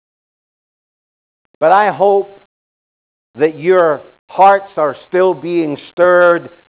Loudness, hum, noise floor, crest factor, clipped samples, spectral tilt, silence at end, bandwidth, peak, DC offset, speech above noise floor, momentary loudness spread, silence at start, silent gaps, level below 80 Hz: -13 LUFS; none; under -90 dBFS; 14 dB; under 0.1%; -9.5 dB/octave; 0.2 s; 4 kHz; 0 dBFS; under 0.1%; over 78 dB; 8 LU; 1.6 s; 2.46-3.34 s, 4.19-4.28 s; -64 dBFS